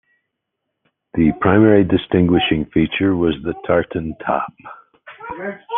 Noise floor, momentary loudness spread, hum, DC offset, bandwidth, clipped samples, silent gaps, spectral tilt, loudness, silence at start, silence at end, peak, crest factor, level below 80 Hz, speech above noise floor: -77 dBFS; 16 LU; none; under 0.1%; 3.9 kHz; under 0.1%; none; -10.5 dB/octave; -17 LUFS; 1.15 s; 0 s; 0 dBFS; 18 dB; -44 dBFS; 60 dB